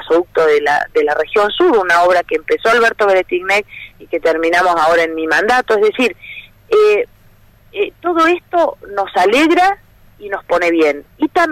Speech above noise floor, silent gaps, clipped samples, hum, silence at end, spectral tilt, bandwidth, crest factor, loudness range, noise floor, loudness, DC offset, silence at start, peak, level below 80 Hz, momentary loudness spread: 33 dB; none; under 0.1%; none; 0 s; -3.5 dB/octave; 15.5 kHz; 10 dB; 2 LU; -46 dBFS; -13 LUFS; under 0.1%; 0 s; -4 dBFS; -48 dBFS; 11 LU